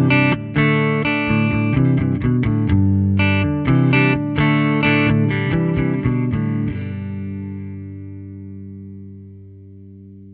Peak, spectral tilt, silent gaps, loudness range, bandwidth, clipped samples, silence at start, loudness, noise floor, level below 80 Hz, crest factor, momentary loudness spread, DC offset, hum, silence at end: -2 dBFS; -10.5 dB/octave; none; 13 LU; 4.7 kHz; under 0.1%; 0 s; -17 LUFS; -39 dBFS; -38 dBFS; 16 dB; 19 LU; under 0.1%; 50 Hz at -40 dBFS; 0 s